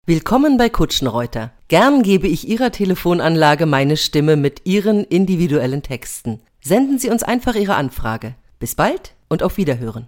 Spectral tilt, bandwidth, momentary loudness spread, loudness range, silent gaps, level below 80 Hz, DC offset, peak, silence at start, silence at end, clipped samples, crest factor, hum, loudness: -5.5 dB/octave; 17 kHz; 12 LU; 4 LU; none; -34 dBFS; under 0.1%; 0 dBFS; 0.05 s; 0 s; under 0.1%; 16 dB; none; -16 LUFS